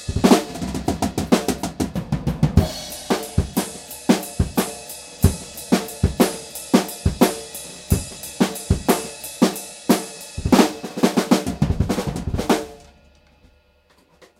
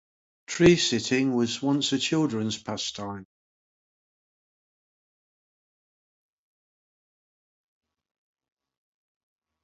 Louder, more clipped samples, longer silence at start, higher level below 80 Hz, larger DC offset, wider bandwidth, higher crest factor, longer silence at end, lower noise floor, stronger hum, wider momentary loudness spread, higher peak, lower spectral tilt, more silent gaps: first, -21 LUFS vs -24 LUFS; neither; second, 0 s vs 0.5 s; first, -34 dBFS vs -60 dBFS; neither; first, 17 kHz vs 8 kHz; about the same, 22 dB vs 24 dB; second, 0.15 s vs 6.4 s; second, -57 dBFS vs under -90 dBFS; neither; second, 12 LU vs 16 LU; first, 0 dBFS vs -6 dBFS; about the same, -5.5 dB/octave vs -4.5 dB/octave; neither